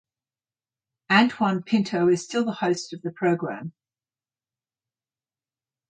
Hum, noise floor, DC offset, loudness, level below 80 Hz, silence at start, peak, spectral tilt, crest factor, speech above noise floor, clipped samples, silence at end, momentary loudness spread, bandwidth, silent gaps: none; under -90 dBFS; under 0.1%; -23 LUFS; -72 dBFS; 1.1 s; -4 dBFS; -5.5 dB/octave; 22 dB; over 67 dB; under 0.1%; 2.2 s; 13 LU; 9.4 kHz; none